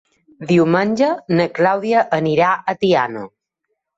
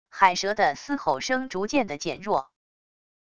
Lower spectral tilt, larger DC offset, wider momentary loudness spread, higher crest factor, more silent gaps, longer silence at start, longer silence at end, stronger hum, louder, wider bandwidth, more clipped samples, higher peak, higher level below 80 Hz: first, -7 dB/octave vs -3.5 dB/octave; neither; about the same, 9 LU vs 7 LU; second, 14 dB vs 22 dB; neither; first, 0.4 s vs 0.05 s; about the same, 0.7 s vs 0.65 s; neither; first, -17 LUFS vs -25 LUFS; second, 8 kHz vs 11 kHz; neither; about the same, -2 dBFS vs -4 dBFS; about the same, -60 dBFS vs -60 dBFS